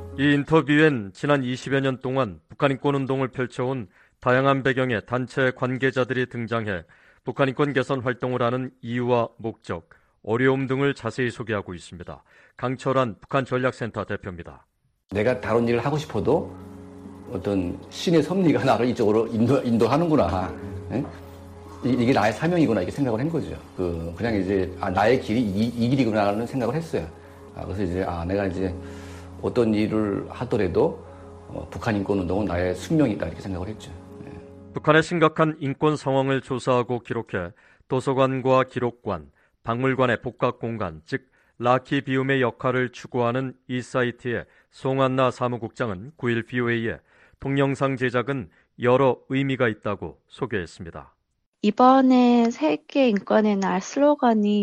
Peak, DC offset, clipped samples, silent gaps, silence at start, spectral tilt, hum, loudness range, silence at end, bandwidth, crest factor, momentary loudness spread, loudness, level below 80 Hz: -4 dBFS; under 0.1%; under 0.1%; 51.46-51.53 s; 0 s; -7 dB/octave; none; 5 LU; 0 s; 12 kHz; 20 dB; 15 LU; -24 LUFS; -52 dBFS